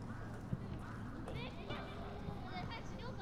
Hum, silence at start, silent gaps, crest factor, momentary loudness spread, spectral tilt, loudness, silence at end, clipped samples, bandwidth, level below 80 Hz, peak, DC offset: none; 0 s; none; 18 dB; 3 LU; -6.5 dB/octave; -47 LUFS; 0 s; under 0.1%; 14 kHz; -54 dBFS; -26 dBFS; under 0.1%